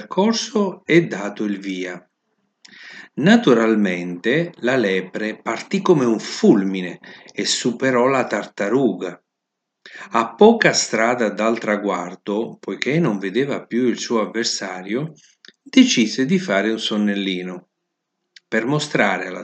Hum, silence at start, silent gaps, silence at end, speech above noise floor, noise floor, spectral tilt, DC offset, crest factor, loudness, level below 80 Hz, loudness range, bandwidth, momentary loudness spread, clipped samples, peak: none; 0 s; none; 0 s; 60 dB; -79 dBFS; -4.5 dB/octave; under 0.1%; 20 dB; -19 LUFS; -74 dBFS; 3 LU; 9.2 kHz; 12 LU; under 0.1%; 0 dBFS